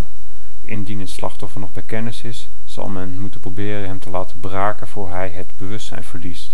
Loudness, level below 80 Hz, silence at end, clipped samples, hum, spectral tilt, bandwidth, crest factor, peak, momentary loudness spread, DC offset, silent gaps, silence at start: -28 LUFS; -44 dBFS; 0 s; under 0.1%; none; -6 dB/octave; 17.5 kHz; 24 dB; -2 dBFS; 10 LU; 60%; none; 0 s